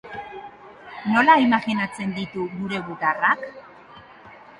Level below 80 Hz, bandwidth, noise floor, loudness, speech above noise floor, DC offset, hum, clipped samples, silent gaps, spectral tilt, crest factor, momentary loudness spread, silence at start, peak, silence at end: -62 dBFS; 11 kHz; -46 dBFS; -21 LUFS; 25 dB; under 0.1%; none; under 0.1%; none; -6 dB/octave; 20 dB; 22 LU; 0.05 s; -4 dBFS; 0.2 s